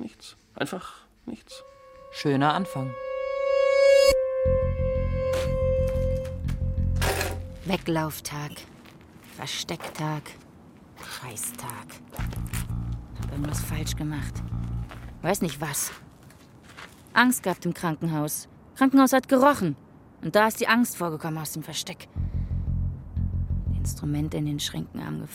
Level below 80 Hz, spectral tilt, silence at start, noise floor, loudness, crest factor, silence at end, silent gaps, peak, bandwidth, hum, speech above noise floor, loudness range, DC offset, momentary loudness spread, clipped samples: -38 dBFS; -5 dB/octave; 0 s; -50 dBFS; -26 LUFS; 24 dB; 0 s; none; -4 dBFS; 16.5 kHz; none; 24 dB; 11 LU; under 0.1%; 20 LU; under 0.1%